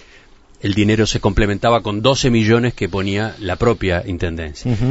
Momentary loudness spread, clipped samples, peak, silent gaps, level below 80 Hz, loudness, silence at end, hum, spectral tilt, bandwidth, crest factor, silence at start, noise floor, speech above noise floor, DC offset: 9 LU; under 0.1%; 0 dBFS; none; -30 dBFS; -17 LUFS; 0 s; none; -5.5 dB/octave; 8 kHz; 16 dB; 0.65 s; -45 dBFS; 29 dB; under 0.1%